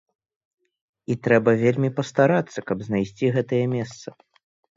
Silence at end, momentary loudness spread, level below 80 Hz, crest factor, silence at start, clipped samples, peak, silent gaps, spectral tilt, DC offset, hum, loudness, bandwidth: 0.65 s; 14 LU; -60 dBFS; 20 dB; 1.1 s; under 0.1%; -4 dBFS; none; -7.5 dB/octave; under 0.1%; none; -22 LUFS; 7.8 kHz